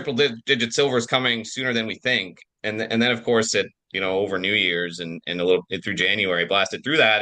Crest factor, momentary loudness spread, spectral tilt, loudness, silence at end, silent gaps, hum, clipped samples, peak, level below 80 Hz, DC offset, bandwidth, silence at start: 18 dB; 8 LU; -3.5 dB/octave; -22 LUFS; 0 s; none; none; under 0.1%; -4 dBFS; -66 dBFS; under 0.1%; 10 kHz; 0 s